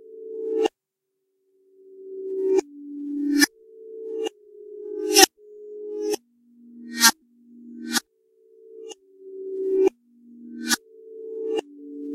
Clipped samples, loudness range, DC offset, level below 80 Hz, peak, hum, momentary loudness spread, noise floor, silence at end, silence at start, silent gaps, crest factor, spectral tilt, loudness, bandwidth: under 0.1%; 7 LU; under 0.1%; -72 dBFS; 0 dBFS; none; 25 LU; -81 dBFS; 0 s; 0.05 s; none; 26 dB; 0 dB/octave; -23 LUFS; 16 kHz